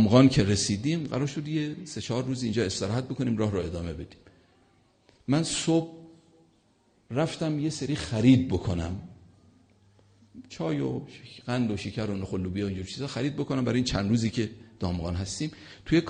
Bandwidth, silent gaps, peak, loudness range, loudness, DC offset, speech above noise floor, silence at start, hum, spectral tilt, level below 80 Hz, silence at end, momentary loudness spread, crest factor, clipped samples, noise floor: 9.6 kHz; none; -6 dBFS; 5 LU; -28 LUFS; under 0.1%; 38 dB; 0 s; none; -6 dB/octave; -50 dBFS; 0 s; 12 LU; 22 dB; under 0.1%; -65 dBFS